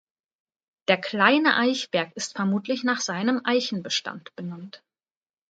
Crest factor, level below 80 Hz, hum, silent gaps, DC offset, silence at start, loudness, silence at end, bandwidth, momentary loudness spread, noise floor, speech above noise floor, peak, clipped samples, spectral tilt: 22 dB; -76 dBFS; none; none; under 0.1%; 0.9 s; -24 LUFS; 0.7 s; 9.2 kHz; 17 LU; under -90 dBFS; over 65 dB; -4 dBFS; under 0.1%; -3.5 dB/octave